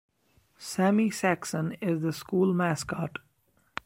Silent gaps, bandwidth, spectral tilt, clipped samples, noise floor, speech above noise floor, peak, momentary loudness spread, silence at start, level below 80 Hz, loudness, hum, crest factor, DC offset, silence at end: none; 16 kHz; -6 dB/octave; under 0.1%; -69 dBFS; 42 dB; -10 dBFS; 13 LU; 0.6 s; -64 dBFS; -28 LUFS; none; 18 dB; under 0.1%; 0.75 s